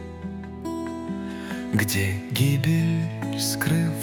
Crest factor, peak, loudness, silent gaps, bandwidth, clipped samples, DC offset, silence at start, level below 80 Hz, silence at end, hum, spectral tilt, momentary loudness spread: 18 dB; -6 dBFS; -25 LUFS; none; 18 kHz; under 0.1%; under 0.1%; 0 s; -54 dBFS; 0 s; none; -5 dB/octave; 12 LU